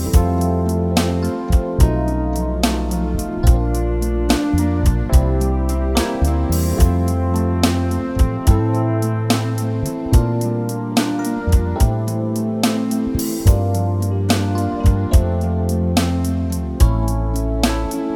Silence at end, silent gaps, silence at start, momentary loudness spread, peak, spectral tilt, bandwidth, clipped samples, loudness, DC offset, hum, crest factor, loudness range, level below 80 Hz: 0 s; none; 0 s; 5 LU; 0 dBFS; -6.5 dB/octave; 19 kHz; under 0.1%; -18 LUFS; under 0.1%; none; 16 dB; 1 LU; -20 dBFS